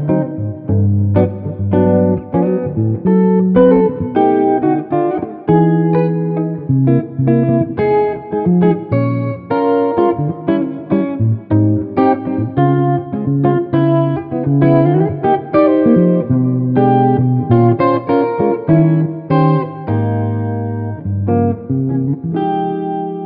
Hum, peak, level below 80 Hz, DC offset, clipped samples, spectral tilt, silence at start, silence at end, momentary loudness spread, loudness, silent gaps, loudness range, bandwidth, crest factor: none; 0 dBFS; -46 dBFS; under 0.1%; under 0.1%; -9.5 dB/octave; 0 s; 0 s; 7 LU; -14 LUFS; none; 3 LU; 5 kHz; 12 dB